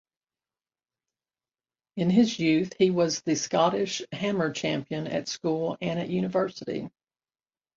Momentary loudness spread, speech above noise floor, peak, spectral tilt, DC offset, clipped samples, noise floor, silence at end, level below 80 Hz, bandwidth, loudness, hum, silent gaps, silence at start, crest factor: 8 LU; over 64 dB; -10 dBFS; -5 dB/octave; under 0.1%; under 0.1%; under -90 dBFS; 0.9 s; -66 dBFS; 7.8 kHz; -27 LUFS; none; none; 1.95 s; 20 dB